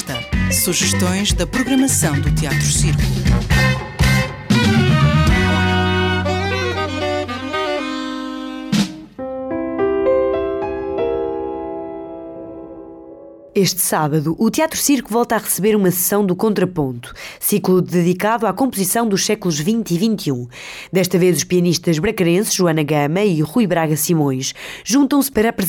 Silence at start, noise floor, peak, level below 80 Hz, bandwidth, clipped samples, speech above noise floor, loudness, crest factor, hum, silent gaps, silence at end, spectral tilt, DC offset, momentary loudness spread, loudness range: 0 s; -38 dBFS; -6 dBFS; -32 dBFS; 18 kHz; under 0.1%; 22 dB; -17 LUFS; 12 dB; none; none; 0 s; -4.5 dB/octave; under 0.1%; 11 LU; 6 LU